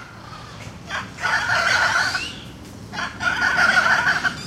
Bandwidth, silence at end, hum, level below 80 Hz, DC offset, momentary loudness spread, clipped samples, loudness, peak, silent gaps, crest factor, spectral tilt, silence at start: 15.5 kHz; 0 s; none; -48 dBFS; under 0.1%; 21 LU; under 0.1%; -19 LUFS; -6 dBFS; none; 16 dB; -2 dB/octave; 0 s